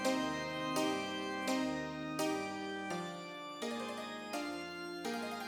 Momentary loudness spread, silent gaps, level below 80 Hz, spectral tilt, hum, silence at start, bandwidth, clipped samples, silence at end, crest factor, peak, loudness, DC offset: 8 LU; none; -72 dBFS; -3.5 dB/octave; none; 0 s; 19 kHz; under 0.1%; 0 s; 18 dB; -22 dBFS; -39 LUFS; under 0.1%